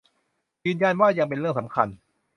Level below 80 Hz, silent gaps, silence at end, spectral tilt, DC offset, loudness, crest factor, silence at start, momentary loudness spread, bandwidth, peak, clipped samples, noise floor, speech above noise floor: -64 dBFS; none; 0.4 s; -7.5 dB/octave; under 0.1%; -24 LUFS; 22 dB; 0.65 s; 9 LU; 6.8 kHz; -4 dBFS; under 0.1%; -74 dBFS; 51 dB